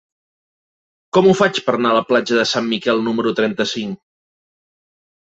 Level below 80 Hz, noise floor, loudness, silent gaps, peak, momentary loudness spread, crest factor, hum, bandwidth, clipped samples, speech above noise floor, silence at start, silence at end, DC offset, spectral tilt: -60 dBFS; under -90 dBFS; -17 LUFS; none; -2 dBFS; 8 LU; 18 dB; none; 8 kHz; under 0.1%; over 74 dB; 1.15 s; 1.25 s; under 0.1%; -5 dB/octave